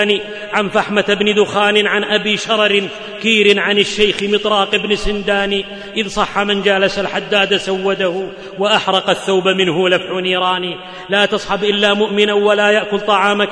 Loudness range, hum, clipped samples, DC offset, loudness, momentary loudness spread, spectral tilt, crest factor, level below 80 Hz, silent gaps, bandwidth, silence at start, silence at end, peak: 2 LU; none; under 0.1%; under 0.1%; -14 LUFS; 7 LU; -4 dB/octave; 14 dB; -40 dBFS; none; 10.5 kHz; 0 s; 0 s; 0 dBFS